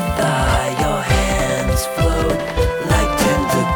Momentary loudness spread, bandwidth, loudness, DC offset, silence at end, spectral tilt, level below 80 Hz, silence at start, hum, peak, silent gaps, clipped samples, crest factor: 3 LU; over 20 kHz; -17 LUFS; under 0.1%; 0 s; -5 dB/octave; -24 dBFS; 0 s; none; -4 dBFS; none; under 0.1%; 14 dB